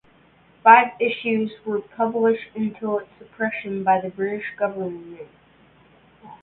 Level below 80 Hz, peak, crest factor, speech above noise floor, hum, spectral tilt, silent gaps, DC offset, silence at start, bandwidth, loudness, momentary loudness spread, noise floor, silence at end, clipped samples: -66 dBFS; 0 dBFS; 22 dB; 34 dB; none; -10 dB/octave; none; under 0.1%; 0.65 s; 4.2 kHz; -21 LUFS; 16 LU; -55 dBFS; 0.1 s; under 0.1%